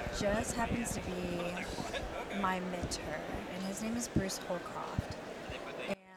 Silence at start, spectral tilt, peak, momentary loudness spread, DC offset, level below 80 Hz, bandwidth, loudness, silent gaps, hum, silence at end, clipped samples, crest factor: 0 s; -4.5 dB/octave; -18 dBFS; 7 LU; under 0.1%; -50 dBFS; 19 kHz; -38 LUFS; none; none; 0 s; under 0.1%; 20 dB